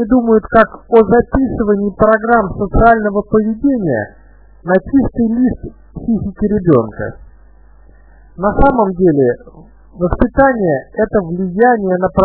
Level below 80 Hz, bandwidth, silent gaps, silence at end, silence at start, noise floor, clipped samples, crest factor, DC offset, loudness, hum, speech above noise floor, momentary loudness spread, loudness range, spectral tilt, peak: -28 dBFS; 4 kHz; none; 0 s; 0 s; -43 dBFS; 0.2%; 14 dB; 0.4%; -13 LUFS; none; 30 dB; 10 LU; 5 LU; -12 dB/octave; 0 dBFS